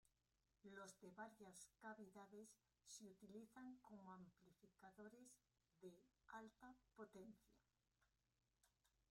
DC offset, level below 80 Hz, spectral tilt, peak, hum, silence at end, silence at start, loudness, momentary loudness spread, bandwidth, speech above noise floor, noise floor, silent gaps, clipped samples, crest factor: under 0.1%; under -90 dBFS; -4 dB/octave; -46 dBFS; none; 0.25 s; 0.05 s; -64 LUFS; 6 LU; 16 kHz; 24 dB; -88 dBFS; none; under 0.1%; 18 dB